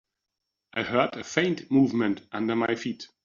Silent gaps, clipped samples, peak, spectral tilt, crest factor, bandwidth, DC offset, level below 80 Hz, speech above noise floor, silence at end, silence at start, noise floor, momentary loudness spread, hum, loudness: none; under 0.1%; -6 dBFS; -4.5 dB/octave; 20 dB; 7.4 kHz; under 0.1%; -68 dBFS; 58 dB; 0.2 s; 0.75 s; -84 dBFS; 9 LU; none; -26 LUFS